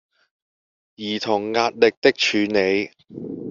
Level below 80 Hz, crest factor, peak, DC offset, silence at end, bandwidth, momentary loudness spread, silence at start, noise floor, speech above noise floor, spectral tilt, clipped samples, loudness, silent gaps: -64 dBFS; 20 dB; -2 dBFS; under 0.1%; 0 s; 7.6 kHz; 16 LU; 1 s; under -90 dBFS; over 70 dB; -2 dB/octave; under 0.1%; -20 LUFS; 1.97-2.02 s